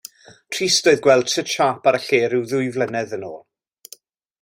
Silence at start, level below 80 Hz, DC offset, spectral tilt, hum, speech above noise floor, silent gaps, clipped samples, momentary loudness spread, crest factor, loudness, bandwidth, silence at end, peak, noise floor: 0.5 s; -64 dBFS; under 0.1%; -3 dB/octave; none; 29 dB; none; under 0.1%; 14 LU; 18 dB; -18 LUFS; 16 kHz; 1.05 s; -2 dBFS; -48 dBFS